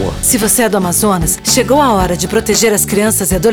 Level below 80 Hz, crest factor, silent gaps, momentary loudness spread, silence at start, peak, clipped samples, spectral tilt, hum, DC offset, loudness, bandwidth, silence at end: -28 dBFS; 10 dB; none; 3 LU; 0 s; 0 dBFS; under 0.1%; -3.5 dB/octave; none; under 0.1%; -11 LUFS; 20 kHz; 0 s